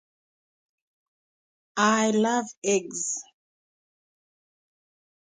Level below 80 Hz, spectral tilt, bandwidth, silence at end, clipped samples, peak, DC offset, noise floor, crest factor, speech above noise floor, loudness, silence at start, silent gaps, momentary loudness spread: -76 dBFS; -3 dB/octave; 9.6 kHz; 2.1 s; under 0.1%; -8 dBFS; under 0.1%; under -90 dBFS; 22 dB; over 66 dB; -25 LUFS; 1.75 s; 2.57-2.62 s; 10 LU